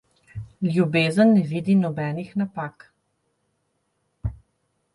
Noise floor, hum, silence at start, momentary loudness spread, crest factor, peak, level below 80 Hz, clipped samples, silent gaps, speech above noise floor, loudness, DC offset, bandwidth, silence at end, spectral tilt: -72 dBFS; none; 0.35 s; 18 LU; 16 dB; -8 dBFS; -46 dBFS; under 0.1%; none; 52 dB; -21 LUFS; under 0.1%; 11.5 kHz; 0.6 s; -7.5 dB/octave